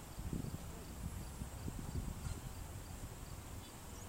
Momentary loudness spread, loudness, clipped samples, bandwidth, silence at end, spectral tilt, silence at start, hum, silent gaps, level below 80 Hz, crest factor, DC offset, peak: 5 LU; -48 LUFS; under 0.1%; 16 kHz; 0 s; -5 dB/octave; 0 s; none; none; -50 dBFS; 16 dB; under 0.1%; -30 dBFS